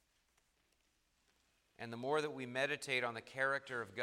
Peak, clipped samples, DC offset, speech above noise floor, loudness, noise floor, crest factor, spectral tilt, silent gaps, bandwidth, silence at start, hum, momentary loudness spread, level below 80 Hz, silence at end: -22 dBFS; under 0.1%; under 0.1%; 39 dB; -39 LUFS; -79 dBFS; 20 dB; -4 dB/octave; none; 15.5 kHz; 1.8 s; none; 8 LU; -84 dBFS; 0 s